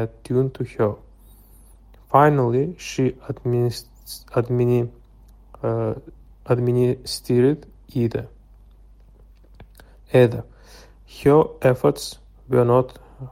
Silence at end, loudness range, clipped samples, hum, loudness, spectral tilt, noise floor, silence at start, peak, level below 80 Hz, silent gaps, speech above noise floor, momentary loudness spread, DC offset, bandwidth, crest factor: 0 s; 4 LU; under 0.1%; none; -21 LUFS; -7 dB/octave; -49 dBFS; 0 s; -2 dBFS; -48 dBFS; none; 29 dB; 15 LU; under 0.1%; 16 kHz; 20 dB